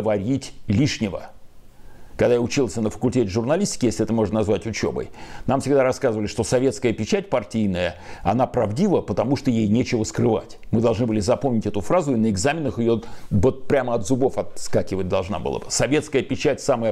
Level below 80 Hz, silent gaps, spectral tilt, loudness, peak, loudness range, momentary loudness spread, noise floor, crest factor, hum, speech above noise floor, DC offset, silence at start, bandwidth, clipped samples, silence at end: -44 dBFS; none; -6 dB/octave; -22 LUFS; -8 dBFS; 2 LU; 6 LU; -41 dBFS; 14 dB; none; 20 dB; under 0.1%; 0 s; 13.5 kHz; under 0.1%; 0 s